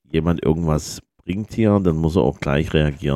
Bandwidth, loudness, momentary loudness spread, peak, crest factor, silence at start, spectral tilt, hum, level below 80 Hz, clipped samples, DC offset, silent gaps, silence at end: 13.5 kHz; -20 LUFS; 11 LU; -2 dBFS; 18 dB; 0.15 s; -7 dB/octave; none; -34 dBFS; under 0.1%; under 0.1%; none; 0 s